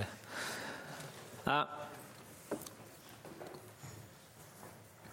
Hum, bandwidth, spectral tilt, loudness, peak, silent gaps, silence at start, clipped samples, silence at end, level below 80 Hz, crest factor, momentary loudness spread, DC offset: none; 16.5 kHz; -3.5 dB/octave; -43 LUFS; -18 dBFS; none; 0 s; under 0.1%; 0 s; -74 dBFS; 26 dB; 19 LU; under 0.1%